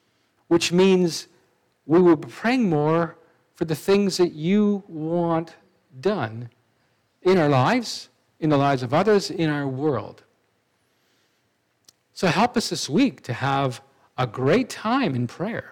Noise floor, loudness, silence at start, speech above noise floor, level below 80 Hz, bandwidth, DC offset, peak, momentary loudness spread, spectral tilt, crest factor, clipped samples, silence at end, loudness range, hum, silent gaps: -69 dBFS; -22 LUFS; 0.5 s; 47 dB; -64 dBFS; 16.5 kHz; under 0.1%; -6 dBFS; 12 LU; -6 dB/octave; 16 dB; under 0.1%; 0 s; 5 LU; none; none